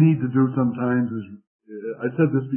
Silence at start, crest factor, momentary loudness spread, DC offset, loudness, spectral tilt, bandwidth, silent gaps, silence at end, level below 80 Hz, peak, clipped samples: 0 s; 16 dB; 15 LU; under 0.1%; -22 LUFS; -14 dB/octave; 3.2 kHz; 1.47-1.59 s; 0 s; -66 dBFS; -6 dBFS; under 0.1%